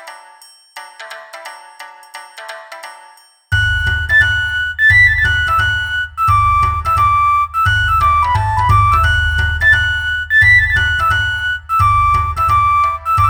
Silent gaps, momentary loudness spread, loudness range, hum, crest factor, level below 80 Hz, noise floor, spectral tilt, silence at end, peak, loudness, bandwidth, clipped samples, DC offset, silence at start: none; 22 LU; 10 LU; none; 14 dB; -28 dBFS; -44 dBFS; -3.5 dB/octave; 0 s; 0 dBFS; -12 LUFS; 19 kHz; under 0.1%; under 0.1%; 0 s